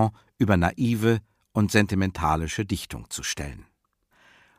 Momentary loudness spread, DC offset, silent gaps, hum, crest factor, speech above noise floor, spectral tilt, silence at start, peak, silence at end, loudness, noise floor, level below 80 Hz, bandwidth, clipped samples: 10 LU; under 0.1%; none; none; 20 dB; 44 dB; -5.5 dB/octave; 0 s; -6 dBFS; 0.95 s; -25 LUFS; -69 dBFS; -44 dBFS; 15.5 kHz; under 0.1%